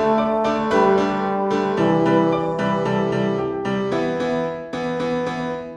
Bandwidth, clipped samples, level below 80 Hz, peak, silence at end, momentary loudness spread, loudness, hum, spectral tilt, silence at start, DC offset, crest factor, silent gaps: 10 kHz; under 0.1%; -50 dBFS; -4 dBFS; 0 s; 7 LU; -20 LUFS; none; -7 dB/octave; 0 s; under 0.1%; 16 dB; none